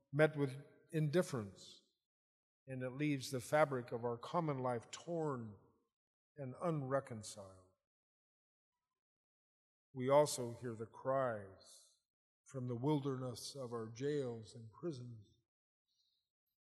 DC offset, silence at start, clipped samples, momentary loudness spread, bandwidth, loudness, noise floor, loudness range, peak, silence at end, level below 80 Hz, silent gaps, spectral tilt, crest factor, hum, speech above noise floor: under 0.1%; 0.1 s; under 0.1%; 19 LU; 15.5 kHz; -40 LUFS; under -90 dBFS; 7 LU; -18 dBFS; 1.4 s; -84 dBFS; 2.05-2.66 s, 5.93-6.35 s, 7.87-8.72 s, 8.99-9.94 s, 12.05-12.44 s; -6 dB/octave; 26 dB; none; over 50 dB